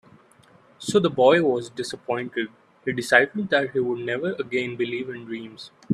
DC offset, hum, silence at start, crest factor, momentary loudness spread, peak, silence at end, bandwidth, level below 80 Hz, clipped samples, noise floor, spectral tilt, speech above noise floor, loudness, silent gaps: under 0.1%; none; 0.8 s; 24 dB; 16 LU; 0 dBFS; 0 s; 13.5 kHz; -68 dBFS; under 0.1%; -55 dBFS; -5 dB/octave; 32 dB; -23 LUFS; none